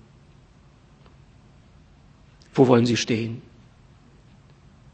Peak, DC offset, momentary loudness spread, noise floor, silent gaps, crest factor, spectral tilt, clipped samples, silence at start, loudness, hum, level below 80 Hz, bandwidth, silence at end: -2 dBFS; under 0.1%; 15 LU; -53 dBFS; none; 26 dB; -6 dB/octave; under 0.1%; 2.55 s; -21 LUFS; none; -58 dBFS; 8.6 kHz; 1.55 s